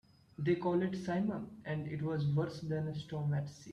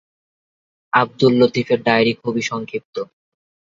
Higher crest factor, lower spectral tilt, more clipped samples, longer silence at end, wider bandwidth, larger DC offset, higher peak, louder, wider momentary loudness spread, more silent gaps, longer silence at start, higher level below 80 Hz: about the same, 16 dB vs 20 dB; first, -8 dB/octave vs -5.5 dB/octave; neither; second, 0 s vs 0.6 s; first, 9.6 kHz vs 7.6 kHz; neither; second, -20 dBFS vs 0 dBFS; second, -37 LUFS vs -18 LUFS; second, 7 LU vs 14 LU; second, none vs 2.85-2.93 s; second, 0.4 s vs 0.95 s; second, -68 dBFS vs -60 dBFS